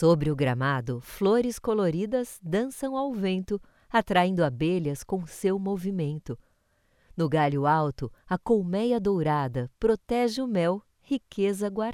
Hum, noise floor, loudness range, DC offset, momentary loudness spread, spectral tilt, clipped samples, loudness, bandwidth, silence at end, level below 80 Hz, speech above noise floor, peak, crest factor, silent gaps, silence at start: none; -68 dBFS; 2 LU; under 0.1%; 9 LU; -6.5 dB/octave; under 0.1%; -27 LUFS; 16 kHz; 0 s; -52 dBFS; 42 dB; -8 dBFS; 18 dB; none; 0 s